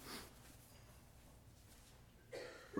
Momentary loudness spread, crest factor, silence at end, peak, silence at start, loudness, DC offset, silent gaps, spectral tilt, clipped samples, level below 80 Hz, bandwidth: 11 LU; 26 dB; 0 s; -30 dBFS; 0 s; -58 LUFS; under 0.1%; none; -4 dB/octave; under 0.1%; -68 dBFS; 19 kHz